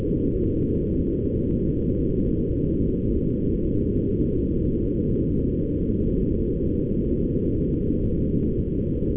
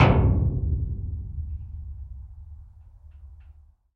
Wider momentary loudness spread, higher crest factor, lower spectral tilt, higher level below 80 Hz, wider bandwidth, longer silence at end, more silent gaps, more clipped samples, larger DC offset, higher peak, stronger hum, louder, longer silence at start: second, 1 LU vs 27 LU; second, 12 dB vs 22 dB; first, -14.5 dB/octave vs -9 dB/octave; about the same, -30 dBFS vs -32 dBFS; second, 3.6 kHz vs 6.2 kHz; second, 0 s vs 0.45 s; neither; neither; neither; second, -10 dBFS vs -4 dBFS; neither; first, -24 LUFS vs -27 LUFS; about the same, 0 s vs 0 s